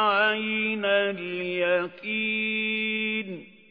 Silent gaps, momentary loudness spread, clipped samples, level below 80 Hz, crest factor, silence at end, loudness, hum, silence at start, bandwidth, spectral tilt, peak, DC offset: none; 7 LU; under 0.1%; -76 dBFS; 16 dB; 0.25 s; -25 LUFS; none; 0 s; 5.2 kHz; -7.5 dB/octave; -10 dBFS; under 0.1%